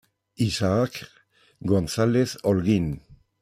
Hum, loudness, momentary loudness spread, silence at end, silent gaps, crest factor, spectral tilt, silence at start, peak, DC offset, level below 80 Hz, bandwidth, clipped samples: none; -24 LUFS; 11 LU; 0.25 s; none; 18 dB; -6.5 dB/octave; 0.4 s; -8 dBFS; under 0.1%; -50 dBFS; 15.5 kHz; under 0.1%